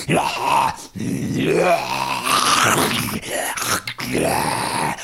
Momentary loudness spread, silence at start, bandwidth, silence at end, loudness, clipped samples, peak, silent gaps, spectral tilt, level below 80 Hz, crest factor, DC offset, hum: 8 LU; 0 s; 16.5 kHz; 0 s; -19 LUFS; under 0.1%; -4 dBFS; none; -3 dB/octave; -48 dBFS; 16 dB; 0.1%; none